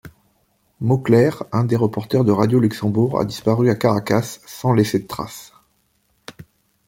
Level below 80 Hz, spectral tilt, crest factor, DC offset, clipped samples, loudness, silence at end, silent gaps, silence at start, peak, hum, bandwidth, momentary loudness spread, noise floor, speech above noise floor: -54 dBFS; -7 dB/octave; 16 dB; under 0.1%; under 0.1%; -19 LUFS; 0.45 s; none; 0.05 s; -2 dBFS; none; 16.5 kHz; 11 LU; -64 dBFS; 46 dB